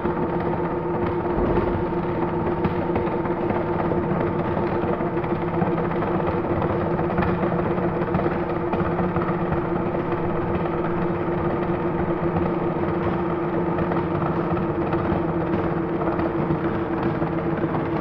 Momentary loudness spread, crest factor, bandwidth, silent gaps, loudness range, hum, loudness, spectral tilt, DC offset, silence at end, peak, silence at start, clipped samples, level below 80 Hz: 2 LU; 14 dB; 5.4 kHz; none; 1 LU; none; -24 LUFS; -10.5 dB/octave; under 0.1%; 0 s; -8 dBFS; 0 s; under 0.1%; -40 dBFS